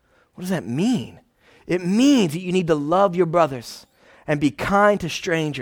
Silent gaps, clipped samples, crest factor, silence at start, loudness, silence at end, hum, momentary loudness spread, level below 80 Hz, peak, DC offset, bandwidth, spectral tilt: none; under 0.1%; 16 dB; 0.4 s; -20 LUFS; 0 s; none; 17 LU; -52 dBFS; -4 dBFS; under 0.1%; 18 kHz; -5.5 dB/octave